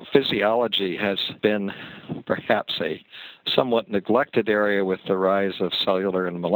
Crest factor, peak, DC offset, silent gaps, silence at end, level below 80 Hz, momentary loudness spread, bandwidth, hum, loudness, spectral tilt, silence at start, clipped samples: 22 dB; -2 dBFS; under 0.1%; none; 0 s; -64 dBFS; 10 LU; over 20 kHz; none; -23 LUFS; -7 dB/octave; 0 s; under 0.1%